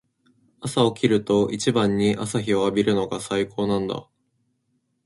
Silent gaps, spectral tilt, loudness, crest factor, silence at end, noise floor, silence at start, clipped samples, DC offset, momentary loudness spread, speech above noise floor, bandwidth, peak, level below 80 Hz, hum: none; -5.5 dB/octave; -22 LUFS; 18 dB; 1.05 s; -71 dBFS; 0.6 s; under 0.1%; under 0.1%; 6 LU; 50 dB; 11.5 kHz; -4 dBFS; -56 dBFS; none